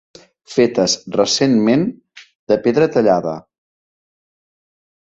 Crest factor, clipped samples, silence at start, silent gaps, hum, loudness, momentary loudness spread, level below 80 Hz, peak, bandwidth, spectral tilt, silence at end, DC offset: 16 dB; under 0.1%; 0.5 s; 2.35-2.47 s; none; -16 LUFS; 9 LU; -58 dBFS; -2 dBFS; 8.2 kHz; -4.5 dB/octave; 1.65 s; under 0.1%